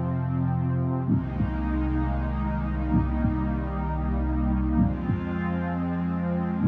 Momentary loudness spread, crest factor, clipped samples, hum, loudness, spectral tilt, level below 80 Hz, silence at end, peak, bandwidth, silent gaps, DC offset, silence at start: 4 LU; 14 dB; under 0.1%; none; -27 LUFS; -11 dB/octave; -32 dBFS; 0 s; -10 dBFS; 4.1 kHz; none; under 0.1%; 0 s